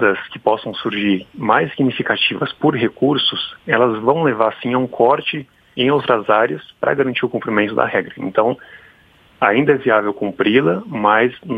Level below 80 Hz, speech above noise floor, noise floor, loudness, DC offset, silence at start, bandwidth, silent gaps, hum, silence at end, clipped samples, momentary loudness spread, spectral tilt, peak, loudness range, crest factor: -58 dBFS; 34 dB; -50 dBFS; -17 LUFS; under 0.1%; 0 s; 5 kHz; none; none; 0 s; under 0.1%; 6 LU; -8 dB/octave; 0 dBFS; 2 LU; 18 dB